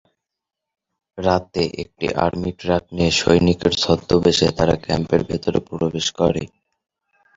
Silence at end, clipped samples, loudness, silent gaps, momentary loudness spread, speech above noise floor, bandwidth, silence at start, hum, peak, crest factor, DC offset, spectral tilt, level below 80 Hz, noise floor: 0.9 s; under 0.1%; -19 LUFS; none; 8 LU; 65 dB; 7.8 kHz; 1.15 s; none; -2 dBFS; 18 dB; under 0.1%; -5 dB/octave; -40 dBFS; -83 dBFS